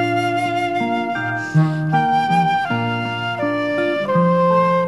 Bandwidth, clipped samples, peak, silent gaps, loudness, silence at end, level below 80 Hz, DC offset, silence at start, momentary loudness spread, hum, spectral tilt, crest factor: 12 kHz; under 0.1%; -4 dBFS; none; -18 LUFS; 0 s; -58 dBFS; 0.2%; 0 s; 6 LU; none; -7 dB/octave; 14 dB